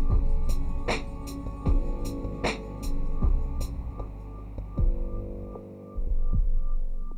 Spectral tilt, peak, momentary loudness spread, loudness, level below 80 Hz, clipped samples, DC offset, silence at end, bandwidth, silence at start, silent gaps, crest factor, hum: -6.5 dB/octave; -14 dBFS; 10 LU; -33 LUFS; -26 dBFS; under 0.1%; under 0.1%; 0 s; 9.2 kHz; 0 s; none; 12 dB; none